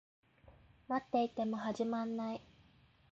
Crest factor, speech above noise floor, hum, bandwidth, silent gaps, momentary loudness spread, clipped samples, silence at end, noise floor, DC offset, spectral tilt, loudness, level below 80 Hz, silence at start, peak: 18 dB; 30 dB; none; 8 kHz; none; 7 LU; under 0.1%; 0.7 s; -67 dBFS; under 0.1%; -5 dB/octave; -38 LUFS; -72 dBFS; 0.45 s; -22 dBFS